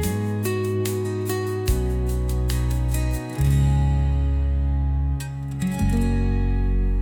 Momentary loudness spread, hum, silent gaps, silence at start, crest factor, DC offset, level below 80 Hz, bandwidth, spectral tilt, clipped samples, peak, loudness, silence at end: 5 LU; none; none; 0 s; 12 dB; under 0.1%; -24 dBFS; 18 kHz; -7 dB/octave; under 0.1%; -10 dBFS; -24 LUFS; 0 s